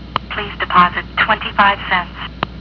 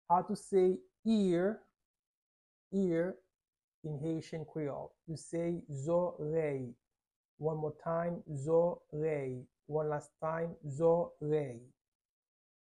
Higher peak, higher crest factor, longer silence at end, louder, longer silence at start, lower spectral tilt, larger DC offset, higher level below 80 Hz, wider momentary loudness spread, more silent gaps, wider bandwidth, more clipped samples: first, 0 dBFS vs -18 dBFS; about the same, 16 dB vs 18 dB; second, 0 s vs 1.1 s; first, -16 LUFS vs -35 LUFS; about the same, 0 s vs 0.1 s; about the same, -6.5 dB/octave vs -7.5 dB/octave; neither; first, -36 dBFS vs -70 dBFS; about the same, 12 LU vs 13 LU; second, none vs 0.99-1.03 s, 1.85-2.71 s, 3.64-3.82 s, 7.16-7.38 s; second, 5.4 kHz vs 11.5 kHz; neither